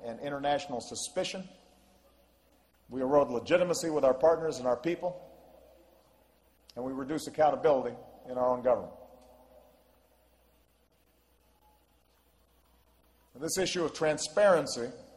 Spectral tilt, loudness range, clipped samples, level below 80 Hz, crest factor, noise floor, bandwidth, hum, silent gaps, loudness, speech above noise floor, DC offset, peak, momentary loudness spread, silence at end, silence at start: -4 dB/octave; 7 LU; under 0.1%; -66 dBFS; 20 dB; -69 dBFS; 14 kHz; none; none; -30 LUFS; 39 dB; under 0.1%; -12 dBFS; 15 LU; 0.1 s; 0 s